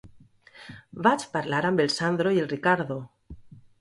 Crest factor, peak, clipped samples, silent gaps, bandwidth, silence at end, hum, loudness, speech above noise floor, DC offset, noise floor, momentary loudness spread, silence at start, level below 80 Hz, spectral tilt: 20 dB; -6 dBFS; under 0.1%; none; 11.5 kHz; 0.2 s; none; -25 LUFS; 29 dB; under 0.1%; -53 dBFS; 20 LU; 0.05 s; -58 dBFS; -5.5 dB/octave